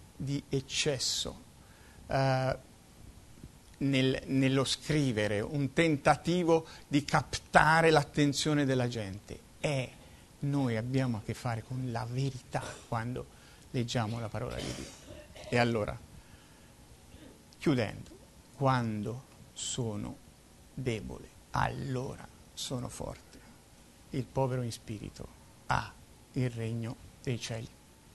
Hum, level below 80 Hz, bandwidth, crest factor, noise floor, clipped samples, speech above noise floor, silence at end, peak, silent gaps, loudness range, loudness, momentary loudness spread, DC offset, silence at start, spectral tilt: none; -54 dBFS; 12.5 kHz; 26 dB; -57 dBFS; under 0.1%; 26 dB; 0.45 s; -6 dBFS; none; 10 LU; -32 LUFS; 18 LU; under 0.1%; 0 s; -5 dB/octave